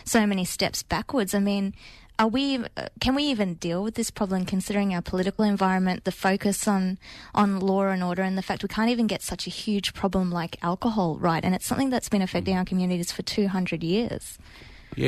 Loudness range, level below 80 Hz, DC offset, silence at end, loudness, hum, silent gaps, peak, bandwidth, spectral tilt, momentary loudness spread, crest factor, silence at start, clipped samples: 2 LU; -48 dBFS; under 0.1%; 0 s; -26 LUFS; none; none; -10 dBFS; 13.5 kHz; -5 dB/octave; 6 LU; 14 dB; 0.05 s; under 0.1%